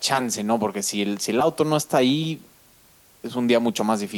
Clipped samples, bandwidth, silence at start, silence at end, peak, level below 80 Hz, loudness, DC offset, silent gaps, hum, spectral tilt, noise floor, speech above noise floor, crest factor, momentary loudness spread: under 0.1%; 19 kHz; 0 s; 0 s; -6 dBFS; -66 dBFS; -22 LUFS; under 0.1%; none; none; -4 dB/octave; -55 dBFS; 32 dB; 18 dB; 9 LU